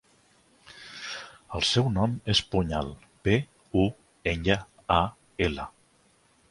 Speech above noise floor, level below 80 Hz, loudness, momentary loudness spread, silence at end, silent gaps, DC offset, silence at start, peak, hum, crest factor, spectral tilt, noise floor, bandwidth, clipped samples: 38 dB; -44 dBFS; -28 LUFS; 14 LU; 0.8 s; none; under 0.1%; 0.75 s; -6 dBFS; none; 22 dB; -5 dB/octave; -64 dBFS; 11.5 kHz; under 0.1%